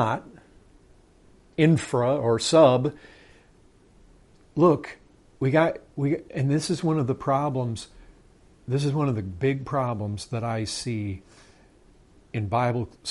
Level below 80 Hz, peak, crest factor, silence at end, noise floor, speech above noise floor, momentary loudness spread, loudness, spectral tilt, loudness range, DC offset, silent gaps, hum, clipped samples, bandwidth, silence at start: -56 dBFS; -4 dBFS; 22 dB; 0 s; -56 dBFS; 33 dB; 12 LU; -25 LUFS; -6.5 dB/octave; 6 LU; under 0.1%; none; none; under 0.1%; 11.5 kHz; 0 s